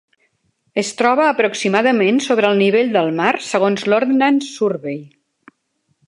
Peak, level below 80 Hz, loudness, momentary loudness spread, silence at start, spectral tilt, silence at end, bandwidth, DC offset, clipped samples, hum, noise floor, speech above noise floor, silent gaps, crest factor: 0 dBFS; -70 dBFS; -16 LUFS; 8 LU; 0.75 s; -4.5 dB/octave; 1 s; 11.5 kHz; under 0.1%; under 0.1%; none; -67 dBFS; 52 dB; none; 16 dB